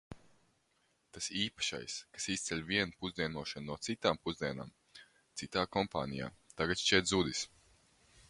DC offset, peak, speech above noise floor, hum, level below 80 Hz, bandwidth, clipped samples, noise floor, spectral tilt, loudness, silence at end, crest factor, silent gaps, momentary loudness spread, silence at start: under 0.1%; -12 dBFS; 40 dB; none; -62 dBFS; 11.5 kHz; under 0.1%; -76 dBFS; -3 dB/octave; -36 LUFS; 0.85 s; 26 dB; none; 16 LU; 0.1 s